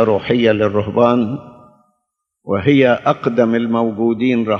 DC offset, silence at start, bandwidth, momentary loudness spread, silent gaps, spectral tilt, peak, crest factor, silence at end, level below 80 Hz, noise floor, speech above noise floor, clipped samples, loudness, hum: under 0.1%; 0 s; 6.4 kHz; 6 LU; none; -8 dB/octave; 0 dBFS; 16 dB; 0 s; -54 dBFS; -74 dBFS; 59 dB; under 0.1%; -15 LUFS; none